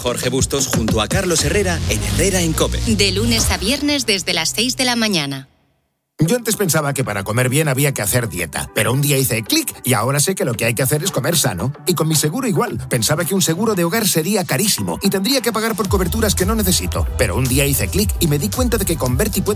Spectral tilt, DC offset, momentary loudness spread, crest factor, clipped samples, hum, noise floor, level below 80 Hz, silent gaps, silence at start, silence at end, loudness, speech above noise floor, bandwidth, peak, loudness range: -4 dB/octave; under 0.1%; 3 LU; 16 dB; under 0.1%; none; -66 dBFS; -30 dBFS; none; 0 s; 0 s; -17 LUFS; 49 dB; 16 kHz; 0 dBFS; 2 LU